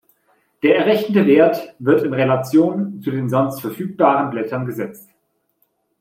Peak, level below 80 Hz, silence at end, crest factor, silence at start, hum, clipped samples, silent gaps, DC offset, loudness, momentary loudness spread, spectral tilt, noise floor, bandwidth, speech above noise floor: 0 dBFS; -64 dBFS; 1 s; 18 dB; 0.65 s; none; under 0.1%; none; under 0.1%; -17 LUFS; 11 LU; -7.5 dB/octave; -68 dBFS; 16.5 kHz; 51 dB